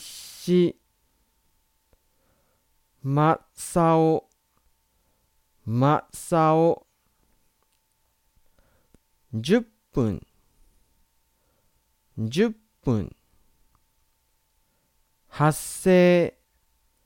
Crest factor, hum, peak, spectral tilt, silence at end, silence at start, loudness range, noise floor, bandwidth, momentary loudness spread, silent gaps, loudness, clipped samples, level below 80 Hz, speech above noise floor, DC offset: 20 dB; none; -6 dBFS; -6.5 dB/octave; 0.75 s; 0 s; 6 LU; -69 dBFS; 17 kHz; 16 LU; none; -23 LUFS; under 0.1%; -54 dBFS; 48 dB; under 0.1%